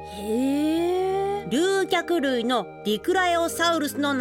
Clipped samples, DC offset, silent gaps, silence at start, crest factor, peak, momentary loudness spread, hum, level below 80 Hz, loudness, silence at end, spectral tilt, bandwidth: under 0.1%; under 0.1%; none; 0 s; 14 dB; -10 dBFS; 4 LU; none; -54 dBFS; -24 LUFS; 0 s; -3.5 dB/octave; 17 kHz